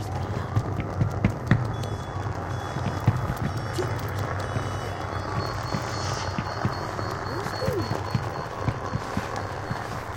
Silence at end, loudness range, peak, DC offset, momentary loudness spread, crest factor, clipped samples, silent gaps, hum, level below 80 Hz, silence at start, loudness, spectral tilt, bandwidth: 0 s; 2 LU; -4 dBFS; under 0.1%; 6 LU; 24 dB; under 0.1%; none; none; -42 dBFS; 0 s; -29 LUFS; -6 dB/octave; 17 kHz